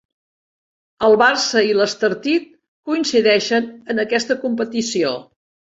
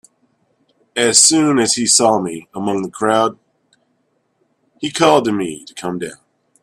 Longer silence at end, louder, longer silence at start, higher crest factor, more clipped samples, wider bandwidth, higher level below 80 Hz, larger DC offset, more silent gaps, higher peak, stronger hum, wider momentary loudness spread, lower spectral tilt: about the same, 0.55 s vs 0.5 s; second, -18 LUFS vs -14 LUFS; about the same, 1 s vs 0.95 s; about the same, 18 dB vs 18 dB; neither; second, 8 kHz vs 15.5 kHz; about the same, -62 dBFS vs -60 dBFS; neither; first, 2.68-2.83 s vs none; about the same, -2 dBFS vs 0 dBFS; neither; second, 9 LU vs 16 LU; about the same, -3 dB/octave vs -2.5 dB/octave